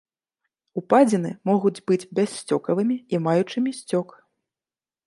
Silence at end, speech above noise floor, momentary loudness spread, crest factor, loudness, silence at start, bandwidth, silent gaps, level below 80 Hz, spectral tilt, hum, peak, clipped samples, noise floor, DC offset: 1.05 s; over 68 dB; 9 LU; 20 dB; -23 LUFS; 0.75 s; 11.5 kHz; none; -72 dBFS; -6.5 dB/octave; none; -4 dBFS; under 0.1%; under -90 dBFS; under 0.1%